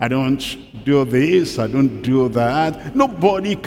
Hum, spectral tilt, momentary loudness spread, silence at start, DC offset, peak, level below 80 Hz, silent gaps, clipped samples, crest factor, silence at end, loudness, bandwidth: none; -6.5 dB/octave; 5 LU; 0 s; under 0.1%; 0 dBFS; -46 dBFS; none; under 0.1%; 16 dB; 0 s; -18 LUFS; 16 kHz